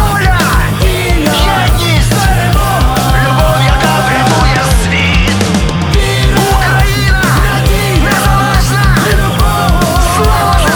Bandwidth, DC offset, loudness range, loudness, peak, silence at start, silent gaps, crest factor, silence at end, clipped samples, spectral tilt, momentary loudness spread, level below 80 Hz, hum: over 20 kHz; under 0.1%; 0 LU; -10 LUFS; 0 dBFS; 0 s; none; 8 dB; 0 s; under 0.1%; -4.5 dB/octave; 2 LU; -14 dBFS; none